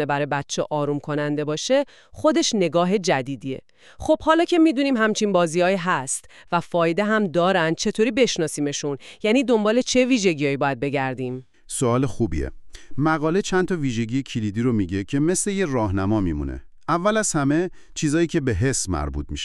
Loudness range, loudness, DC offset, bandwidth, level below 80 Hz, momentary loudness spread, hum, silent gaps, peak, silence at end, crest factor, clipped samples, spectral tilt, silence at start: 3 LU; -22 LUFS; 0.3%; 13 kHz; -42 dBFS; 10 LU; none; none; -4 dBFS; 0 s; 18 dB; under 0.1%; -5 dB/octave; 0 s